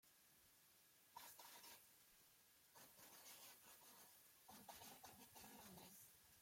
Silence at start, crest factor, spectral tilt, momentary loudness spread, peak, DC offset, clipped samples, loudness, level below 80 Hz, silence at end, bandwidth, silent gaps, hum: 0.05 s; 20 dB; -1.5 dB/octave; 6 LU; -46 dBFS; under 0.1%; under 0.1%; -63 LUFS; under -90 dBFS; 0 s; 16.5 kHz; none; none